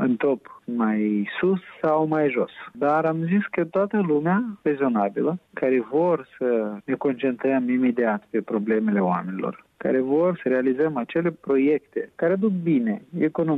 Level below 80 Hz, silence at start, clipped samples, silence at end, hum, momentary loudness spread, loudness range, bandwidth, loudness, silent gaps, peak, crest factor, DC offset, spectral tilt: -68 dBFS; 0 s; under 0.1%; 0 s; none; 5 LU; 1 LU; 4.3 kHz; -23 LUFS; none; -10 dBFS; 12 dB; under 0.1%; -10 dB/octave